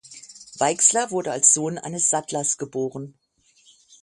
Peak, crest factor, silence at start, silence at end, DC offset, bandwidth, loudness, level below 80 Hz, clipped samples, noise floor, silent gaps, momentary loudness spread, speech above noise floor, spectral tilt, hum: -2 dBFS; 22 dB; 0.1 s; 0.95 s; under 0.1%; 11.5 kHz; -20 LUFS; -70 dBFS; under 0.1%; -59 dBFS; none; 24 LU; 36 dB; -2.5 dB/octave; none